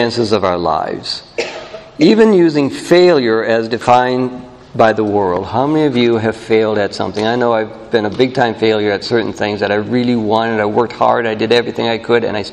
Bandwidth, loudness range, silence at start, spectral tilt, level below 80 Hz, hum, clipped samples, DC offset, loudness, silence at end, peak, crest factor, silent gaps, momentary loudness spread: 11 kHz; 3 LU; 0 s; -6 dB/octave; -50 dBFS; none; under 0.1%; under 0.1%; -14 LUFS; 0 s; 0 dBFS; 14 dB; none; 9 LU